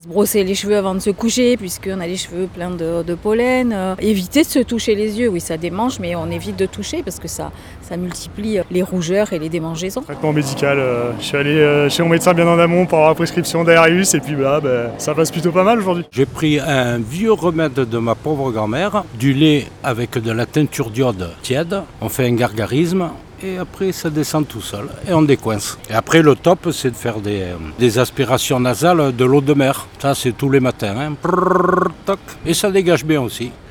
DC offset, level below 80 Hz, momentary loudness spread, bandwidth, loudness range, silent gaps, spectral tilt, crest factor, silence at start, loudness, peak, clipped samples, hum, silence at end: under 0.1%; -44 dBFS; 11 LU; 20 kHz; 6 LU; none; -5 dB/octave; 16 dB; 0.05 s; -17 LUFS; 0 dBFS; under 0.1%; none; 0 s